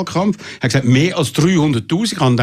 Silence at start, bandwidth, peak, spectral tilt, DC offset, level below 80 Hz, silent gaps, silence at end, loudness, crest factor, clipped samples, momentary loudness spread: 0 s; 14.5 kHz; -2 dBFS; -5.5 dB/octave; under 0.1%; -48 dBFS; none; 0 s; -16 LUFS; 14 dB; under 0.1%; 5 LU